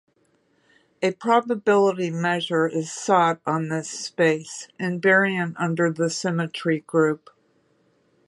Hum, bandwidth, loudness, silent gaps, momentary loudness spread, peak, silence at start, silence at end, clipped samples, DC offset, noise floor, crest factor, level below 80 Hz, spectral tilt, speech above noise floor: none; 11.5 kHz; -22 LUFS; none; 9 LU; -4 dBFS; 1 s; 1.1 s; under 0.1%; under 0.1%; -65 dBFS; 18 dB; -74 dBFS; -5 dB/octave; 43 dB